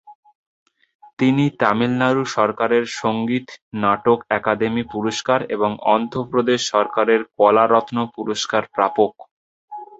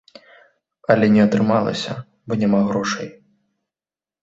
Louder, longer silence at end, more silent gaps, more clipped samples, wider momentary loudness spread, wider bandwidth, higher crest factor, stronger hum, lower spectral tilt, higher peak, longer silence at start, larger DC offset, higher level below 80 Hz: about the same, -19 LUFS vs -18 LUFS; second, 0.05 s vs 1.1 s; first, 0.15-0.23 s, 0.35-0.66 s, 0.95-0.99 s, 1.13-1.17 s, 3.62-3.71 s, 9.31-9.68 s vs none; neither; second, 7 LU vs 15 LU; about the same, 8 kHz vs 7.8 kHz; about the same, 20 dB vs 20 dB; neither; second, -5 dB/octave vs -6.5 dB/octave; about the same, 0 dBFS vs 0 dBFS; second, 0.1 s vs 0.9 s; neither; about the same, -58 dBFS vs -56 dBFS